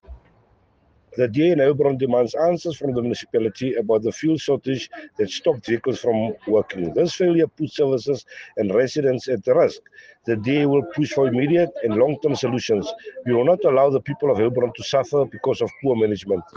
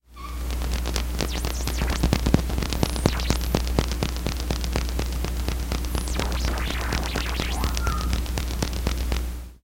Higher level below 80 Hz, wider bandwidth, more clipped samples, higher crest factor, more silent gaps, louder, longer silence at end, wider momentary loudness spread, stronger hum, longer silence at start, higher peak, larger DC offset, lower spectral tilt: second, -58 dBFS vs -26 dBFS; second, 7.6 kHz vs 17 kHz; neither; second, 16 dB vs 24 dB; neither; first, -21 LUFS vs -27 LUFS; about the same, 0.15 s vs 0.05 s; about the same, 7 LU vs 5 LU; neither; about the same, 0.1 s vs 0.1 s; second, -6 dBFS vs 0 dBFS; neither; first, -6.5 dB/octave vs -4.5 dB/octave